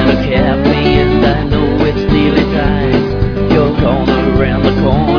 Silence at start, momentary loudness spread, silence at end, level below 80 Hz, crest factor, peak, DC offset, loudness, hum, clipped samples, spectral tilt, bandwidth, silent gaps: 0 s; 3 LU; 0 s; -20 dBFS; 10 dB; 0 dBFS; under 0.1%; -12 LUFS; none; under 0.1%; -8.5 dB/octave; 5.4 kHz; none